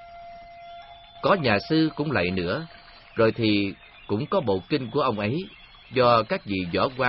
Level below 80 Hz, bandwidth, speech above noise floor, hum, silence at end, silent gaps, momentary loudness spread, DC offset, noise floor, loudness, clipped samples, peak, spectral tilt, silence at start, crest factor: -54 dBFS; 5.8 kHz; 21 dB; none; 0 s; none; 22 LU; under 0.1%; -45 dBFS; -24 LUFS; under 0.1%; -6 dBFS; -10 dB/octave; 0 s; 20 dB